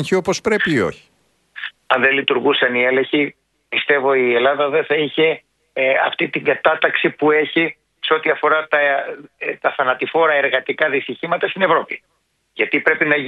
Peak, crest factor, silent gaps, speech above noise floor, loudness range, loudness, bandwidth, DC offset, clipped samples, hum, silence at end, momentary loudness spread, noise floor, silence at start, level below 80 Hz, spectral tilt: 0 dBFS; 18 dB; none; 23 dB; 2 LU; -17 LUFS; 11.5 kHz; under 0.1%; under 0.1%; none; 0 s; 9 LU; -41 dBFS; 0 s; -60 dBFS; -4.5 dB/octave